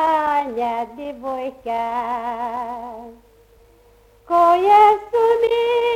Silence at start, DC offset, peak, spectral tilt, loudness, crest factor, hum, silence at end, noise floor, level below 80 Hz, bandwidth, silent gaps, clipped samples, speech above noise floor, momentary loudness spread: 0 s; under 0.1%; -2 dBFS; -4.5 dB/octave; -18 LUFS; 16 dB; none; 0 s; -52 dBFS; -54 dBFS; 15.5 kHz; none; under 0.1%; 34 dB; 17 LU